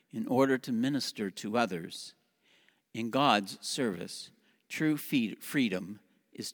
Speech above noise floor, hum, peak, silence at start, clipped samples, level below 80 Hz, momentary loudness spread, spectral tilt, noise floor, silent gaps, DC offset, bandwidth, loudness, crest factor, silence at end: 37 dB; none; -10 dBFS; 0.15 s; under 0.1%; -82 dBFS; 16 LU; -4.5 dB/octave; -69 dBFS; none; under 0.1%; over 20 kHz; -31 LUFS; 24 dB; 0 s